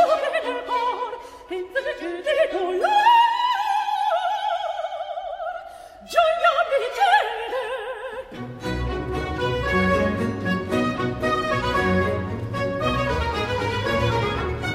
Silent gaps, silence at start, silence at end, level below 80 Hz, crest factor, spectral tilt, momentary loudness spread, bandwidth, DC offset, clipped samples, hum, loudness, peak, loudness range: none; 0 s; 0 s; -40 dBFS; 18 dB; -5.5 dB/octave; 13 LU; 16 kHz; under 0.1%; under 0.1%; none; -23 LUFS; -6 dBFS; 3 LU